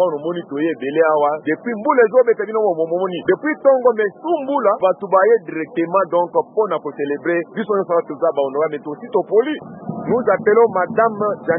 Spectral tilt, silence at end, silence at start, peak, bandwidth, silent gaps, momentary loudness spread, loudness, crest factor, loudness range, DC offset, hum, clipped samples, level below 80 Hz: -11 dB/octave; 0 s; 0 s; -2 dBFS; 3.7 kHz; none; 8 LU; -18 LUFS; 16 dB; 3 LU; under 0.1%; none; under 0.1%; -68 dBFS